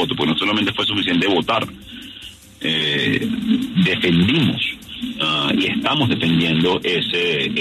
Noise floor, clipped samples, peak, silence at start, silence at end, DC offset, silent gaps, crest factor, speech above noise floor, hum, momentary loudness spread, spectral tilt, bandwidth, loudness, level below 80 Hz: -39 dBFS; under 0.1%; -6 dBFS; 0 s; 0 s; under 0.1%; none; 14 dB; 21 dB; none; 13 LU; -5.5 dB/octave; 13.5 kHz; -18 LUFS; -50 dBFS